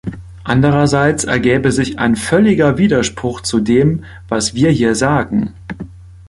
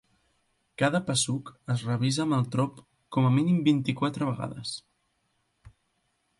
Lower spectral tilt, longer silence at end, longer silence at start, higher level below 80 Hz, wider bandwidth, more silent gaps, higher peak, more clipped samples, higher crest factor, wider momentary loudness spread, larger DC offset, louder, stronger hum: about the same, -5.5 dB/octave vs -5.5 dB/octave; second, 0.05 s vs 0.7 s; second, 0.05 s vs 0.8 s; first, -38 dBFS vs -64 dBFS; about the same, 11.5 kHz vs 11.5 kHz; neither; first, 0 dBFS vs -10 dBFS; neither; about the same, 14 dB vs 18 dB; first, 14 LU vs 11 LU; neither; first, -14 LUFS vs -27 LUFS; neither